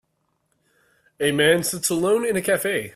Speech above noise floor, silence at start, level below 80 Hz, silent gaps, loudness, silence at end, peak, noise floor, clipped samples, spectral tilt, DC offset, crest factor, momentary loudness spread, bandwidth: 51 dB; 1.2 s; -60 dBFS; none; -21 LUFS; 0.05 s; -4 dBFS; -71 dBFS; under 0.1%; -3.5 dB/octave; under 0.1%; 18 dB; 5 LU; 16 kHz